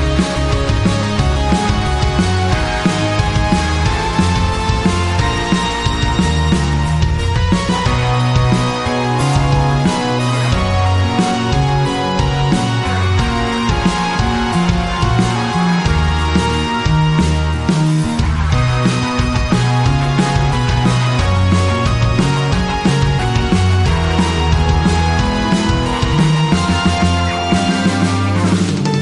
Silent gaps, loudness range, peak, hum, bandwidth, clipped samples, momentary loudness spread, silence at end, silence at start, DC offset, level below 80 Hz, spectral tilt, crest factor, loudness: none; 1 LU; -2 dBFS; none; 11.5 kHz; under 0.1%; 2 LU; 0 s; 0 s; 0.2%; -22 dBFS; -5.5 dB/octave; 12 dB; -15 LUFS